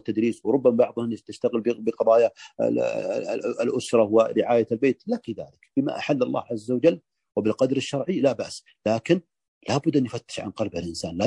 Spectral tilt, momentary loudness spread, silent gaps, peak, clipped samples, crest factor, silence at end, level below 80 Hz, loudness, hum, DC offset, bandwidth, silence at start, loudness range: -6 dB/octave; 11 LU; 9.48-9.61 s; -6 dBFS; under 0.1%; 18 dB; 0 s; -66 dBFS; -24 LUFS; none; under 0.1%; 11.5 kHz; 0.05 s; 3 LU